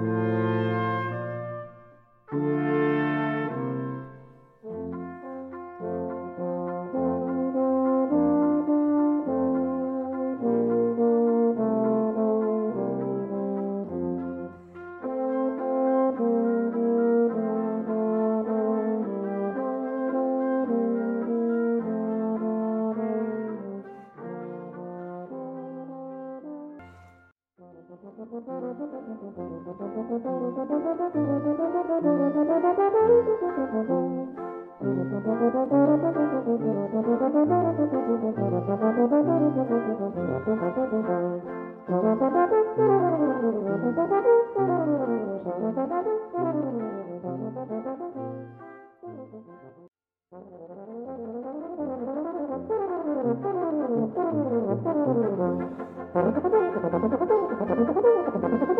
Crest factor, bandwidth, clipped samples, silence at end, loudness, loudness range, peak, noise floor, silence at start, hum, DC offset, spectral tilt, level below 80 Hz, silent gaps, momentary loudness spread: 16 dB; 3.8 kHz; under 0.1%; 0 s; -26 LUFS; 14 LU; -10 dBFS; -59 dBFS; 0 s; none; under 0.1%; -11 dB/octave; -68 dBFS; none; 16 LU